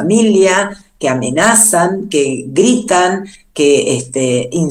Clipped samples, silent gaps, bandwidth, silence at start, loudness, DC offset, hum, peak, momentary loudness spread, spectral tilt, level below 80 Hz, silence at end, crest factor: 0.1%; none; over 20 kHz; 0 s; -12 LUFS; under 0.1%; none; 0 dBFS; 9 LU; -3.5 dB/octave; -50 dBFS; 0 s; 12 dB